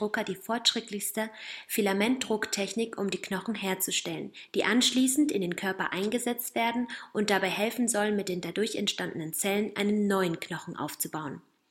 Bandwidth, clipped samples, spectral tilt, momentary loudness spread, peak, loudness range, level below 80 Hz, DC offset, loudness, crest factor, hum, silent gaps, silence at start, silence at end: 16.5 kHz; under 0.1%; -3 dB/octave; 9 LU; -10 dBFS; 2 LU; -72 dBFS; under 0.1%; -29 LUFS; 20 dB; none; none; 0 s; 0.3 s